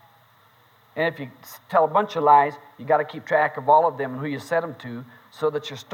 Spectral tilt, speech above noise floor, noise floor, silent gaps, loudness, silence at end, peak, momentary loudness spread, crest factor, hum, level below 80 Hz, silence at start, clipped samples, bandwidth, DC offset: -6 dB/octave; 34 dB; -57 dBFS; none; -22 LUFS; 0 s; -4 dBFS; 20 LU; 18 dB; none; -78 dBFS; 0.95 s; under 0.1%; 17 kHz; under 0.1%